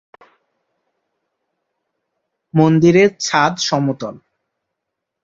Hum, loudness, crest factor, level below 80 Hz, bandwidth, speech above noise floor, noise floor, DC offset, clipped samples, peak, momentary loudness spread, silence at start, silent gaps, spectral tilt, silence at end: none; -15 LUFS; 18 dB; -58 dBFS; 7.8 kHz; 65 dB; -79 dBFS; under 0.1%; under 0.1%; -2 dBFS; 12 LU; 2.55 s; none; -5.5 dB/octave; 1.1 s